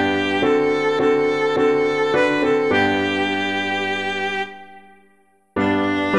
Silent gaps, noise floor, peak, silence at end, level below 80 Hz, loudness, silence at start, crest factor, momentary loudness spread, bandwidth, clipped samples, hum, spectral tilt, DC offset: none; -58 dBFS; -4 dBFS; 0 s; -54 dBFS; -19 LUFS; 0 s; 16 dB; 5 LU; 10.5 kHz; under 0.1%; none; -5 dB/octave; 0.3%